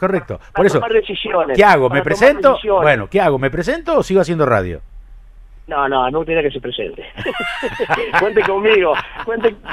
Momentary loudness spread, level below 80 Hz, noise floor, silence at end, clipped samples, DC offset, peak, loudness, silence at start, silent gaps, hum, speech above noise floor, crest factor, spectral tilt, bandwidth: 12 LU; -38 dBFS; -39 dBFS; 0 s; under 0.1%; under 0.1%; 0 dBFS; -15 LUFS; 0 s; none; none; 24 dB; 16 dB; -5.5 dB/octave; 13 kHz